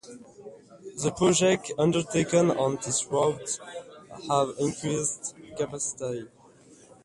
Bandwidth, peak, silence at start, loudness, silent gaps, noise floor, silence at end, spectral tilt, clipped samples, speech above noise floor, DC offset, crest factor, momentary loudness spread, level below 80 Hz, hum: 11.5 kHz; -8 dBFS; 0.05 s; -27 LUFS; none; -54 dBFS; 0.75 s; -4.5 dB/octave; under 0.1%; 27 dB; under 0.1%; 18 dB; 22 LU; -62 dBFS; none